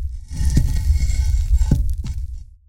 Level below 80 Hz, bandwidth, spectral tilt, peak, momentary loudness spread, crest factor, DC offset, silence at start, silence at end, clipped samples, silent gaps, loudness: -20 dBFS; 15.5 kHz; -6.5 dB/octave; -2 dBFS; 11 LU; 16 dB; under 0.1%; 0 s; 0.15 s; under 0.1%; none; -22 LUFS